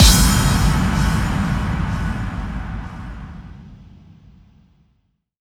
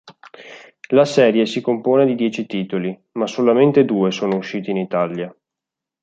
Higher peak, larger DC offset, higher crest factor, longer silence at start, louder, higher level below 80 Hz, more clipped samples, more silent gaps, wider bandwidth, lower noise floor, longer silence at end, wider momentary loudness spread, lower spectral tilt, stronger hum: about the same, 0 dBFS vs -2 dBFS; neither; about the same, 20 dB vs 16 dB; about the same, 0 s vs 0.05 s; about the same, -19 LUFS vs -18 LUFS; first, -24 dBFS vs -66 dBFS; neither; neither; first, 19.5 kHz vs 8 kHz; second, -65 dBFS vs -85 dBFS; first, 1.65 s vs 0.75 s; first, 21 LU vs 11 LU; second, -4 dB/octave vs -6.5 dB/octave; neither